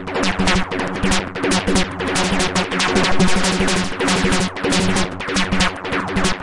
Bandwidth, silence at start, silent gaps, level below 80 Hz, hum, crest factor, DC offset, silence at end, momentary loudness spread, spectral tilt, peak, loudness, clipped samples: 11.5 kHz; 0 s; none; -32 dBFS; none; 14 dB; under 0.1%; 0 s; 4 LU; -4 dB/octave; -4 dBFS; -18 LUFS; under 0.1%